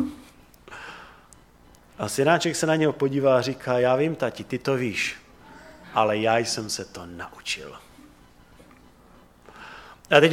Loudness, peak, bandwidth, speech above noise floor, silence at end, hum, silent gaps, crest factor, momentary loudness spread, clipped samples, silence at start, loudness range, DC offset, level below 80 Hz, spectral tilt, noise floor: -24 LUFS; -2 dBFS; 16.5 kHz; 29 dB; 0 s; 60 Hz at -55 dBFS; none; 24 dB; 22 LU; under 0.1%; 0 s; 10 LU; under 0.1%; -58 dBFS; -4.5 dB/octave; -53 dBFS